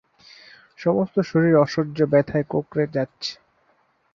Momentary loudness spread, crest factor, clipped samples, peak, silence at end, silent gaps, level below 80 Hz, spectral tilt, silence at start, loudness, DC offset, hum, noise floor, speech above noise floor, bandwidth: 10 LU; 18 dB; under 0.1%; -4 dBFS; 0.8 s; none; -58 dBFS; -7.5 dB/octave; 0.8 s; -22 LUFS; under 0.1%; none; -64 dBFS; 43 dB; 7.4 kHz